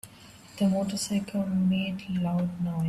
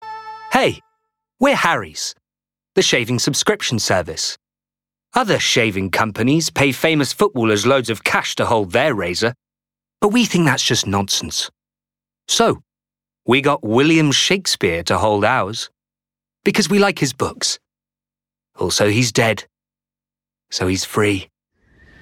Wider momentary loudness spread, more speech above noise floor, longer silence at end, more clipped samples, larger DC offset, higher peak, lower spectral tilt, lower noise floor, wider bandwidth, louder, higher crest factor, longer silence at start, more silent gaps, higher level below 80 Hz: second, 5 LU vs 10 LU; second, 23 dB vs over 73 dB; second, 0 s vs 0.75 s; neither; neither; second, -16 dBFS vs -2 dBFS; first, -6 dB/octave vs -3.5 dB/octave; second, -50 dBFS vs under -90 dBFS; second, 13 kHz vs 17.5 kHz; second, -28 LUFS vs -17 LUFS; second, 12 dB vs 18 dB; about the same, 0.05 s vs 0 s; neither; second, -60 dBFS vs -54 dBFS